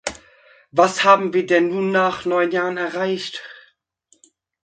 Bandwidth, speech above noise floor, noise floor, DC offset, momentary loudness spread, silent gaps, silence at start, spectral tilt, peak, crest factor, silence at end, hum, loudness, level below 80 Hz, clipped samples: 9.4 kHz; 44 dB; -62 dBFS; under 0.1%; 15 LU; none; 0.05 s; -4.5 dB/octave; 0 dBFS; 20 dB; 1.05 s; none; -19 LUFS; -62 dBFS; under 0.1%